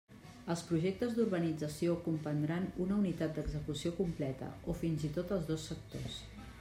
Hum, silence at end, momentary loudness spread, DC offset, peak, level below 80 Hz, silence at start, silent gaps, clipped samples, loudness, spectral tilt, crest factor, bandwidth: none; 0 s; 10 LU; under 0.1%; -22 dBFS; -54 dBFS; 0.1 s; none; under 0.1%; -37 LUFS; -6.5 dB/octave; 16 dB; 16 kHz